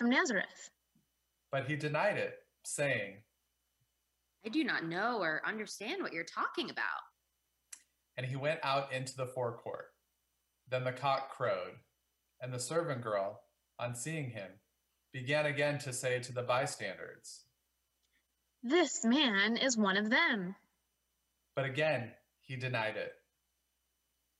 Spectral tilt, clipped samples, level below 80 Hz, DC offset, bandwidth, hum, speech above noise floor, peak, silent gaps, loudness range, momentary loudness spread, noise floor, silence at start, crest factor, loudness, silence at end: -4 dB/octave; under 0.1%; -84 dBFS; under 0.1%; 12.5 kHz; none; 47 dB; -18 dBFS; none; 8 LU; 18 LU; -82 dBFS; 0 s; 18 dB; -35 LUFS; 1.25 s